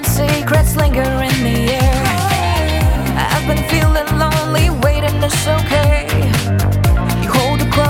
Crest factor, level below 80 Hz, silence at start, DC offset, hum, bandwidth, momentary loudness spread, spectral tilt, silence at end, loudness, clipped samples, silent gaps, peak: 12 dB; -20 dBFS; 0 s; under 0.1%; none; 17.5 kHz; 2 LU; -5 dB/octave; 0 s; -14 LUFS; under 0.1%; none; -2 dBFS